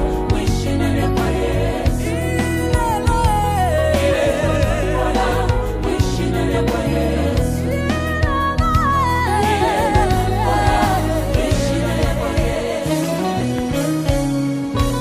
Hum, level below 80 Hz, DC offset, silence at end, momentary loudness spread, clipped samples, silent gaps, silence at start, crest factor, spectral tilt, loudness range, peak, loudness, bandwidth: none; -24 dBFS; under 0.1%; 0 s; 4 LU; under 0.1%; none; 0 s; 14 dB; -6 dB/octave; 2 LU; -2 dBFS; -18 LUFS; 15.5 kHz